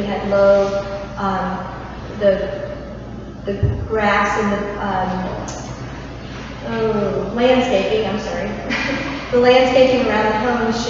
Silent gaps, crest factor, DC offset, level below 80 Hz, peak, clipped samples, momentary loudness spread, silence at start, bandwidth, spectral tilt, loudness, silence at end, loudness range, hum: none; 16 dB; under 0.1%; -36 dBFS; -2 dBFS; under 0.1%; 17 LU; 0 s; 7.6 kHz; -5.5 dB/octave; -18 LUFS; 0 s; 6 LU; none